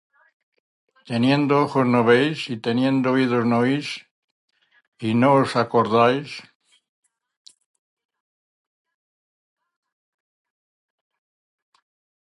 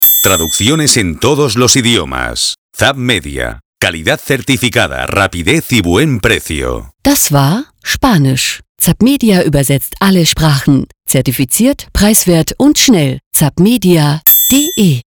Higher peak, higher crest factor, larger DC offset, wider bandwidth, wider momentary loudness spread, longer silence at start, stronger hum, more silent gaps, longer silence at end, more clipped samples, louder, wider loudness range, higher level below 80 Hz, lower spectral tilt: second, -4 dBFS vs 0 dBFS; first, 20 dB vs 10 dB; neither; second, 11.5 kHz vs over 20 kHz; first, 12 LU vs 7 LU; first, 1.05 s vs 0 s; neither; first, 4.11-4.48 s, 4.88-4.92 s vs 2.58-2.69 s, 3.65-3.73 s, 8.69-8.75 s, 13.26-13.31 s; first, 5.9 s vs 0.1 s; neither; second, -20 LUFS vs -10 LUFS; about the same, 5 LU vs 4 LU; second, -68 dBFS vs -30 dBFS; first, -7 dB/octave vs -4 dB/octave